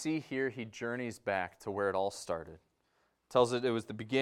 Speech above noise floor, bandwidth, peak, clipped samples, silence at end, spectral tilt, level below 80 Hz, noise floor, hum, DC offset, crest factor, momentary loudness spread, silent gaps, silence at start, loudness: 42 dB; 14 kHz; -12 dBFS; under 0.1%; 0 s; -5 dB/octave; -70 dBFS; -76 dBFS; none; under 0.1%; 22 dB; 10 LU; none; 0 s; -35 LUFS